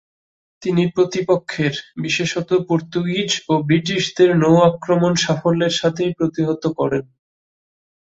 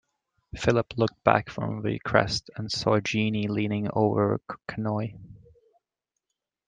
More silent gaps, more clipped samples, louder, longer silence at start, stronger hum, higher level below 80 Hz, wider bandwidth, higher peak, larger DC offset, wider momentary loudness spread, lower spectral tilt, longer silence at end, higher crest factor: neither; neither; first, -18 LUFS vs -27 LUFS; about the same, 0.6 s vs 0.55 s; neither; about the same, -56 dBFS vs -54 dBFS; second, 8 kHz vs 9.4 kHz; about the same, -2 dBFS vs -4 dBFS; neither; about the same, 7 LU vs 9 LU; about the same, -5.5 dB/octave vs -6 dB/octave; second, 1 s vs 1.3 s; second, 16 dB vs 24 dB